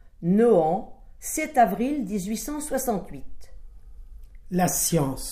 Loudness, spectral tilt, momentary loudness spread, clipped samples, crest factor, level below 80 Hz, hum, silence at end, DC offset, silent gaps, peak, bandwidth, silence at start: -24 LUFS; -5 dB/octave; 12 LU; under 0.1%; 18 dB; -44 dBFS; none; 0 s; under 0.1%; none; -6 dBFS; 15.5 kHz; 0.05 s